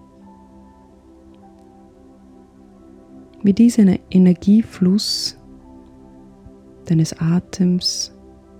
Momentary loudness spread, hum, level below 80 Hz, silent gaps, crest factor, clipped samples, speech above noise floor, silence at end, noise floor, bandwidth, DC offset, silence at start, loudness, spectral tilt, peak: 8 LU; none; -50 dBFS; none; 16 dB; under 0.1%; 31 dB; 0.5 s; -47 dBFS; 14.5 kHz; under 0.1%; 3.45 s; -17 LUFS; -6 dB/octave; -4 dBFS